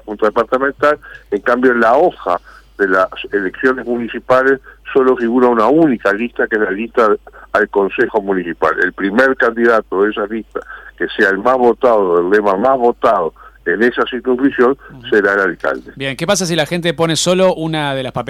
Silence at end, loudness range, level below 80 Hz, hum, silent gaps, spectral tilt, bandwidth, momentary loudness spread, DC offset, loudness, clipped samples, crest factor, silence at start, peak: 0 s; 2 LU; -46 dBFS; none; none; -4.5 dB/octave; 14.5 kHz; 9 LU; under 0.1%; -14 LUFS; under 0.1%; 12 dB; 0.05 s; -2 dBFS